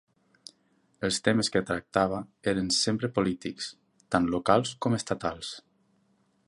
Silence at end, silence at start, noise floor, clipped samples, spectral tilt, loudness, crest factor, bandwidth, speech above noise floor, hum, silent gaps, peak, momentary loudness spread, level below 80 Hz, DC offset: 0.9 s; 1 s; -69 dBFS; under 0.1%; -4.5 dB/octave; -28 LUFS; 24 dB; 11.5 kHz; 41 dB; none; none; -6 dBFS; 12 LU; -56 dBFS; under 0.1%